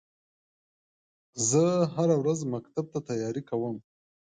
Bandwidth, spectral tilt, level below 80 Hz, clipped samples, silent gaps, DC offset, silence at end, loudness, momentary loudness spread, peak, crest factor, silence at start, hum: 9.6 kHz; -5.5 dB/octave; -70 dBFS; under 0.1%; none; under 0.1%; 0.55 s; -28 LUFS; 11 LU; -12 dBFS; 18 dB; 1.35 s; none